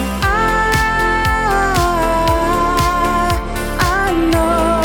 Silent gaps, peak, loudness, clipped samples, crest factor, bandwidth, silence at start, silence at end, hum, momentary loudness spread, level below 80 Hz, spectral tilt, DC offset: none; -2 dBFS; -15 LUFS; under 0.1%; 14 dB; over 20 kHz; 0 s; 0 s; none; 3 LU; -24 dBFS; -5 dB/octave; under 0.1%